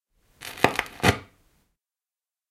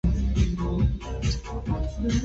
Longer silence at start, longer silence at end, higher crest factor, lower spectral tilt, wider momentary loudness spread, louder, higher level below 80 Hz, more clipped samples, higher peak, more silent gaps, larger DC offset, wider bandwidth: first, 0.4 s vs 0.05 s; first, 1.25 s vs 0 s; first, 28 dB vs 16 dB; second, -4 dB/octave vs -6.5 dB/octave; first, 16 LU vs 5 LU; first, -24 LUFS vs -27 LUFS; second, -50 dBFS vs -28 dBFS; neither; first, 0 dBFS vs -10 dBFS; neither; neither; first, 16 kHz vs 8 kHz